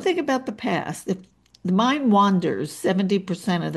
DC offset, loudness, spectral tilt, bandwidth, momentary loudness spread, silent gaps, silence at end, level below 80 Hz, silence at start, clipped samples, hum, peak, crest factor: under 0.1%; -23 LUFS; -6 dB/octave; 12.5 kHz; 11 LU; none; 0 s; -66 dBFS; 0 s; under 0.1%; none; -8 dBFS; 16 dB